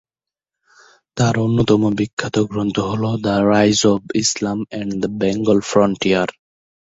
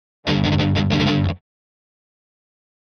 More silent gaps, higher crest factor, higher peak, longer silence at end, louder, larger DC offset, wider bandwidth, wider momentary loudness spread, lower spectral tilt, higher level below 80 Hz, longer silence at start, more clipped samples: first, 2.13-2.17 s vs none; about the same, 16 dB vs 16 dB; first, -2 dBFS vs -6 dBFS; second, 0.55 s vs 1.45 s; about the same, -18 LUFS vs -19 LUFS; neither; first, 8 kHz vs 6.8 kHz; first, 9 LU vs 6 LU; second, -5 dB/octave vs -6.5 dB/octave; second, -48 dBFS vs -40 dBFS; first, 1.15 s vs 0.25 s; neither